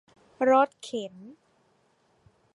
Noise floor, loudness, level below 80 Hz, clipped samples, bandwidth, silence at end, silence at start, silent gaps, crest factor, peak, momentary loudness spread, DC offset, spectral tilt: -67 dBFS; -26 LUFS; -78 dBFS; under 0.1%; 11 kHz; 1.25 s; 0.4 s; none; 20 dB; -8 dBFS; 15 LU; under 0.1%; -4.5 dB/octave